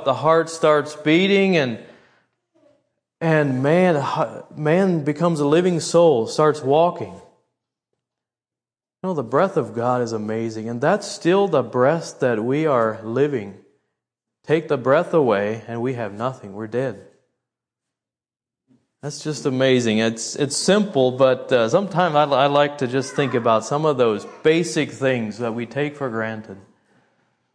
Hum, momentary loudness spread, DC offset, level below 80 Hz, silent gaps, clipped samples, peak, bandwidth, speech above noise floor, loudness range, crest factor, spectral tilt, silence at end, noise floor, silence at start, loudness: none; 10 LU; under 0.1%; -70 dBFS; none; under 0.1%; -2 dBFS; 10.5 kHz; over 71 dB; 7 LU; 18 dB; -5.5 dB/octave; 0.95 s; under -90 dBFS; 0 s; -20 LUFS